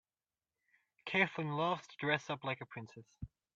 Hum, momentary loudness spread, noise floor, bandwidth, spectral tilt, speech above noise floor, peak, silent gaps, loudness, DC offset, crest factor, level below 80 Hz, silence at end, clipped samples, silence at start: none; 19 LU; under -90 dBFS; 7.8 kHz; -5.5 dB/octave; over 52 dB; -16 dBFS; none; -36 LUFS; under 0.1%; 24 dB; -68 dBFS; 0.3 s; under 0.1%; 1.05 s